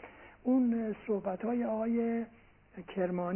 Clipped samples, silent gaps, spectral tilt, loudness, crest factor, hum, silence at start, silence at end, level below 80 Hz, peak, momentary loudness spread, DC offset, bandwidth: under 0.1%; none; -8 dB/octave; -33 LUFS; 12 dB; none; 0 s; 0 s; -66 dBFS; -20 dBFS; 17 LU; under 0.1%; 3.3 kHz